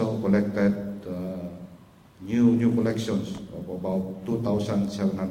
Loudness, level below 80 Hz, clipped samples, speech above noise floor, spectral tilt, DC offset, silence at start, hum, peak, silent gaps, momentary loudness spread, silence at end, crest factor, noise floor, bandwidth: -26 LUFS; -56 dBFS; under 0.1%; 26 dB; -7.5 dB/octave; under 0.1%; 0 s; none; -10 dBFS; none; 14 LU; 0 s; 16 dB; -51 dBFS; 14.5 kHz